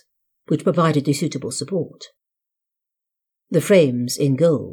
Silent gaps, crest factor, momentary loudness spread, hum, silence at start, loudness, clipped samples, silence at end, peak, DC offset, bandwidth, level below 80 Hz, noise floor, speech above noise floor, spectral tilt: none; 18 dB; 10 LU; none; 0.5 s; -19 LUFS; under 0.1%; 0 s; -4 dBFS; under 0.1%; 18 kHz; -72 dBFS; -84 dBFS; 66 dB; -6 dB/octave